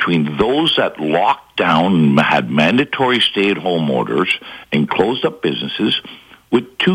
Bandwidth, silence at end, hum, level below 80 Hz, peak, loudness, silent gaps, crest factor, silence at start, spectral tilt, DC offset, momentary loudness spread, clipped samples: 15.5 kHz; 0 s; none; -50 dBFS; -2 dBFS; -16 LUFS; none; 14 dB; 0 s; -6 dB/octave; under 0.1%; 6 LU; under 0.1%